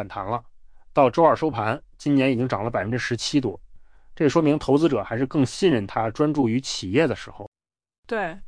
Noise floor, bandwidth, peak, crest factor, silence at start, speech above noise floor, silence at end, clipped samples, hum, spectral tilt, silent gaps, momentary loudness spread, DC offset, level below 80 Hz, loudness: -45 dBFS; 10.5 kHz; -6 dBFS; 18 dB; 0 s; 23 dB; 0 s; under 0.1%; none; -6 dB/octave; 7.47-7.52 s, 7.98-8.03 s; 11 LU; under 0.1%; -50 dBFS; -23 LUFS